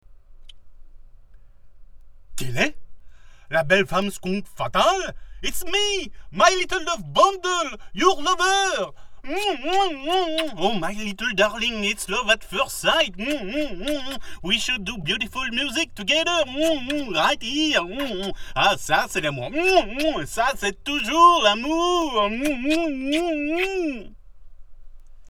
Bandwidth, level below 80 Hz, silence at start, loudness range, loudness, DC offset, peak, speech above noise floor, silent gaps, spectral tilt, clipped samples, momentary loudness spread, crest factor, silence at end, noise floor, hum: 17.5 kHz; -42 dBFS; 0.1 s; 5 LU; -22 LUFS; under 0.1%; -2 dBFS; 22 dB; none; -3 dB/octave; under 0.1%; 9 LU; 20 dB; 0 s; -45 dBFS; none